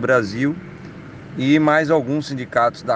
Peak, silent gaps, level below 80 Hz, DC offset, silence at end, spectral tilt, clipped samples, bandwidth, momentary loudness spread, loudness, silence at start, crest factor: -4 dBFS; none; -56 dBFS; under 0.1%; 0 s; -6.5 dB/octave; under 0.1%; 8.8 kHz; 22 LU; -18 LUFS; 0 s; 16 dB